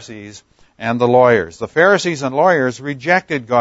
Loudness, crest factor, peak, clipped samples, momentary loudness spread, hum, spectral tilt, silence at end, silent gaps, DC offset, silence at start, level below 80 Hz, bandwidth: -15 LUFS; 16 dB; 0 dBFS; under 0.1%; 12 LU; none; -5.5 dB/octave; 0 s; none; under 0.1%; 0 s; -56 dBFS; 8 kHz